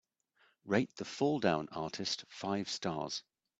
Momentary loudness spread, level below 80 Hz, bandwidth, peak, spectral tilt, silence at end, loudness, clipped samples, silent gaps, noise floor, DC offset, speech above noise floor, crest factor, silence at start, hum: 8 LU; -74 dBFS; 8.6 kHz; -14 dBFS; -4.5 dB/octave; 0.4 s; -36 LUFS; under 0.1%; none; -73 dBFS; under 0.1%; 37 dB; 24 dB; 0.65 s; none